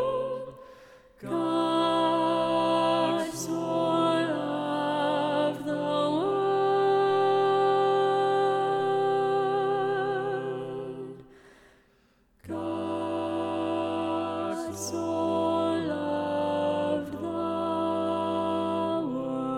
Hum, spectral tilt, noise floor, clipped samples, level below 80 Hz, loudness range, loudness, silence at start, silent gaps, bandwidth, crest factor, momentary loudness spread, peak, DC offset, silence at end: none; -5.5 dB/octave; -64 dBFS; under 0.1%; -68 dBFS; 8 LU; -27 LUFS; 0 s; none; 15 kHz; 14 dB; 9 LU; -14 dBFS; under 0.1%; 0 s